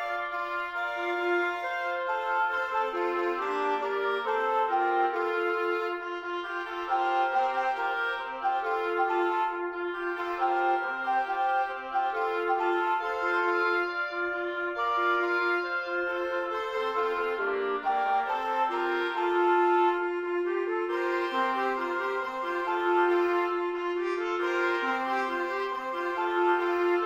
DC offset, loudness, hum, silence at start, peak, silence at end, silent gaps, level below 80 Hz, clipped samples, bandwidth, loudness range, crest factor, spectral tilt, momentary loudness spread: under 0.1%; -28 LUFS; none; 0 s; -14 dBFS; 0 s; none; -68 dBFS; under 0.1%; 7.8 kHz; 2 LU; 14 dB; -3.5 dB/octave; 6 LU